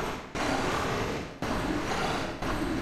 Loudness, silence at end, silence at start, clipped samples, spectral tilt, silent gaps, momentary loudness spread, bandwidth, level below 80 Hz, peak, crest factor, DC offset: -31 LUFS; 0 s; 0 s; under 0.1%; -4.5 dB/octave; none; 5 LU; 16 kHz; -42 dBFS; -16 dBFS; 14 dB; under 0.1%